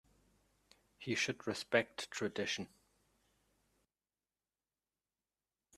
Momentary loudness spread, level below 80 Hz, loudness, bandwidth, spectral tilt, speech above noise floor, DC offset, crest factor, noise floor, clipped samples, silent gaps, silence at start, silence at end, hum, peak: 9 LU; -80 dBFS; -38 LUFS; 14 kHz; -3.5 dB/octave; over 51 dB; under 0.1%; 28 dB; under -90 dBFS; under 0.1%; none; 1 s; 3.1 s; none; -16 dBFS